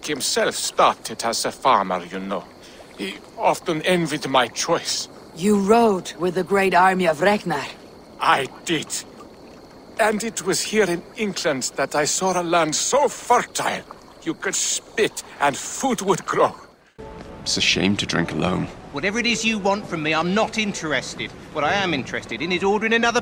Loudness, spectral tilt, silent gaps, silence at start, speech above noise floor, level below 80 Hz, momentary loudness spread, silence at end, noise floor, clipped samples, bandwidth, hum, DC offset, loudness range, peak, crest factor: -21 LUFS; -3 dB/octave; none; 0 s; 22 dB; -52 dBFS; 11 LU; 0 s; -43 dBFS; under 0.1%; 16.5 kHz; none; under 0.1%; 4 LU; -4 dBFS; 18 dB